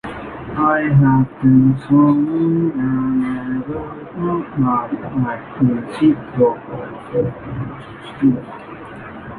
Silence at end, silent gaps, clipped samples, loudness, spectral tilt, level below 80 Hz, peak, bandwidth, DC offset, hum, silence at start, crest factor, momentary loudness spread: 0 s; none; under 0.1%; -17 LUFS; -10 dB/octave; -44 dBFS; -2 dBFS; 4.4 kHz; under 0.1%; none; 0.05 s; 16 dB; 17 LU